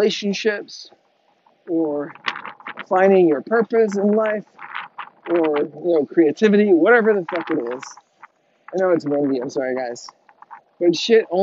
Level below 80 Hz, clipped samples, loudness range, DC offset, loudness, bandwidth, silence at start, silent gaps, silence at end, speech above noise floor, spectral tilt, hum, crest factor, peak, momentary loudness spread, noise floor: -76 dBFS; under 0.1%; 6 LU; under 0.1%; -19 LUFS; 7.8 kHz; 0 s; none; 0 s; 43 dB; -4 dB/octave; none; 18 dB; -2 dBFS; 18 LU; -61 dBFS